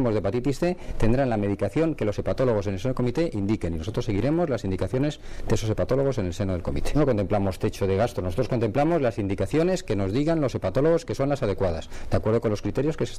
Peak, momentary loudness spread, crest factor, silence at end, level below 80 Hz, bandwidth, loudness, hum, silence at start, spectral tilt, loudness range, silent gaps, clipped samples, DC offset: -8 dBFS; 5 LU; 16 dB; 0 s; -36 dBFS; 14 kHz; -25 LUFS; none; 0 s; -7.5 dB/octave; 2 LU; none; under 0.1%; under 0.1%